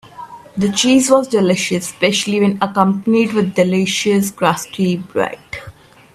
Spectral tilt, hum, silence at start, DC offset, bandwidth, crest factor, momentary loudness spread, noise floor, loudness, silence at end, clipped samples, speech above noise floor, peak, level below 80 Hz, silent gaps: -4.5 dB/octave; none; 0.15 s; under 0.1%; 15 kHz; 16 dB; 13 LU; -35 dBFS; -15 LUFS; 0.45 s; under 0.1%; 20 dB; 0 dBFS; -54 dBFS; none